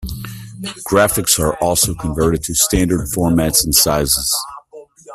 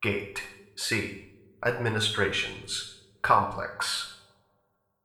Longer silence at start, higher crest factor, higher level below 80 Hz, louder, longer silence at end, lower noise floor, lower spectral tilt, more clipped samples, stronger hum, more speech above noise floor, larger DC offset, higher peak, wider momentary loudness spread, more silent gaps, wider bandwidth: about the same, 0 s vs 0 s; second, 16 dB vs 24 dB; first, -32 dBFS vs -58 dBFS; first, -14 LUFS vs -29 LUFS; second, 0 s vs 0.85 s; second, -40 dBFS vs -74 dBFS; about the same, -3.5 dB/octave vs -3.5 dB/octave; neither; neither; second, 24 dB vs 45 dB; neither; first, 0 dBFS vs -8 dBFS; about the same, 16 LU vs 14 LU; neither; about the same, 16 kHz vs 16.5 kHz